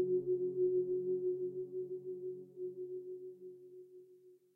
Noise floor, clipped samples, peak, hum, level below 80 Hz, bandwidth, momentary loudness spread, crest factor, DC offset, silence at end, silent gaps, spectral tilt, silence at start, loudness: -63 dBFS; under 0.1%; -26 dBFS; none; under -90 dBFS; 1 kHz; 21 LU; 14 dB; under 0.1%; 0.2 s; none; -12 dB/octave; 0 s; -39 LUFS